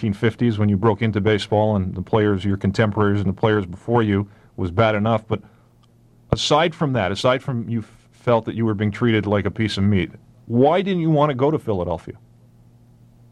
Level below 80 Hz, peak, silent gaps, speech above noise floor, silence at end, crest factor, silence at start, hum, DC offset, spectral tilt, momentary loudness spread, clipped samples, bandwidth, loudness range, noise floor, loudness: -48 dBFS; -2 dBFS; none; 34 dB; 1.15 s; 18 dB; 0 s; none; under 0.1%; -7 dB/octave; 8 LU; under 0.1%; 10.5 kHz; 2 LU; -53 dBFS; -20 LUFS